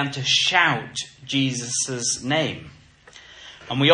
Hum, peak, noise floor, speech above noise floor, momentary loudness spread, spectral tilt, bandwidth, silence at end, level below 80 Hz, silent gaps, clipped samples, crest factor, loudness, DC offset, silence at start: none; -2 dBFS; -48 dBFS; 27 dB; 20 LU; -3 dB/octave; 11 kHz; 0 s; -60 dBFS; none; under 0.1%; 22 dB; -21 LUFS; under 0.1%; 0 s